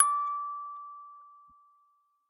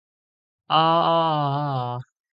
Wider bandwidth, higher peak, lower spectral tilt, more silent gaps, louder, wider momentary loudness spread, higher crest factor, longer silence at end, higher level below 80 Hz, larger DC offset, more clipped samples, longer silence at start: first, 10.5 kHz vs 5.4 kHz; about the same, -6 dBFS vs -8 dBFS; second, 4 dB/octave vs -8.5 dB/octave; neither; second, -32 LUFS vs -21 LUFS; first, 24 LU vs 11 LU; first, 28 dB vs 16 dB; first, 0.95 s vs 0.3 s; second, under -90 dBFS vs -70 dBFS; neither; neither; second, 0 s vs 0.7 s